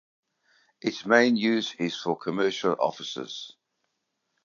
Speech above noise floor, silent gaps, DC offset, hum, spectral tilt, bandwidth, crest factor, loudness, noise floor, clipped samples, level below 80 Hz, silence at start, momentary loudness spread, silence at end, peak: 53 dB; none; under 0.1%; none; -4.5 dB/octave; 7.4 kHz; 22 dB; -26 LUFS; -79 dBFS; under 0.1%; -76 dBFS; 0.85 s; 14 LU; 0.95 s; -6 dBFS